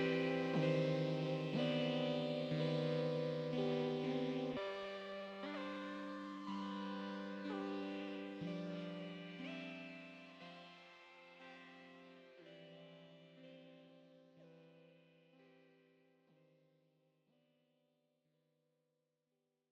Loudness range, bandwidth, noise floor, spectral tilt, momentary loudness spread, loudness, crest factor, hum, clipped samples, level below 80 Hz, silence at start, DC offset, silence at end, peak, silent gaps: 22 LU; 8.6 kHz; -87 dBFS; -7 dB/octave; 22 LU; -42 LUFS; 18 dB; none; under 0.1%; -82 dBFS; 0 s; under 0.1%; 4.3 s; -26 dBFS; none